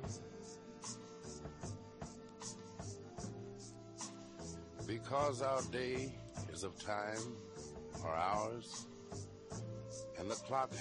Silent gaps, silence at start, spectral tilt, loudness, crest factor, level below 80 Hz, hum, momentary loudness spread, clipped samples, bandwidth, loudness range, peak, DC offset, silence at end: none; 0 s; -4.5 dB/octave; -44 LUFS; 20 dB; -64 dBFS; none; 13 LU; under 0.1%; 11 kHz; 8 LU; -24 dBFS; under 0.1%; 0 s